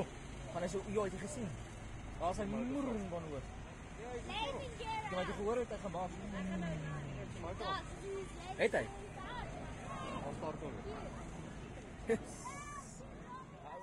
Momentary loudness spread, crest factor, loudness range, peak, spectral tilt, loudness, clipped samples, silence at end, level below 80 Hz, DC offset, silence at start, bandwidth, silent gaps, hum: 11 LU; 24 dB; 3 LU; -18 dBFS; -5.5 dB/octave; -43 LUFS; under 0.1%; 0 s; -54 dBFS; under 0.1%; 0 s; 12.5 kHz; none; none